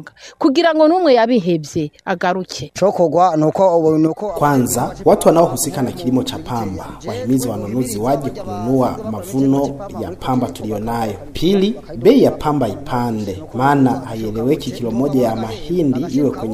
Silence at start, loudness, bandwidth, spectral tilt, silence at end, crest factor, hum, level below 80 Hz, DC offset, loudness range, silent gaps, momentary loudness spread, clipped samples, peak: 0 s; -17 LUFS; 15.5 kHz; -6 dB/octave; 0 s; 16 dB; none; -42 dBFS; under 0.1%; 5 LU; none; 11 LU; under 0.1%; 0 dBFS